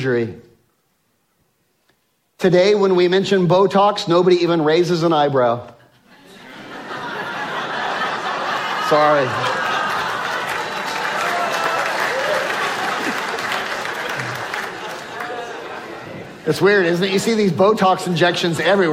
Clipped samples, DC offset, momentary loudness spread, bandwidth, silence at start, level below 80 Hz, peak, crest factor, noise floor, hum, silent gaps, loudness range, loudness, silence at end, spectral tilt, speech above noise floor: under 0.1%; under 0.1%; 14 LU; 16 kHz; 0 s; -62 dBFS; -2 dBFS; 16 dB; -65 dBFS; none; none; 8 LU; -18 LUFS; 0 s; -5 dB/octave; 50 dB